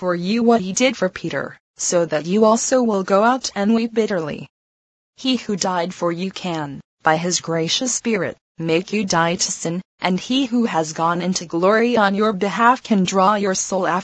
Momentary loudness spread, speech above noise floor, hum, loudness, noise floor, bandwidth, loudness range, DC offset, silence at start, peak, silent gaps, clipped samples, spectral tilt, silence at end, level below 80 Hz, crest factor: 10 LU; over 71 dB; none; -19 LUFS; under -90 dBFS; 9.2 kHz; 5 LU; under 0.1%; 0 s; 0 dBFS; 1.60-1.74 s, 4.50-5.13 s, 6.84-6.97 s, 8.41-8.55 s, 9.85-9.98 s; under 0.1%; -4 dB/octave; 0 s; -60 dBFS; 20 dB